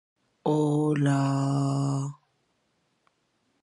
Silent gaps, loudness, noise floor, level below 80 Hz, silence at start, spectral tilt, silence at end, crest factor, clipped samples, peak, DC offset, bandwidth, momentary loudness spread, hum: none; -26 LUFS; -73 dBFS; -74 dBFS; 0.45 s; -7.5 dB/octave; 1.5 s; 16 dB; under 0.1%; -12 dBFS; under 0.1%; 11 kHz; 8 LU; none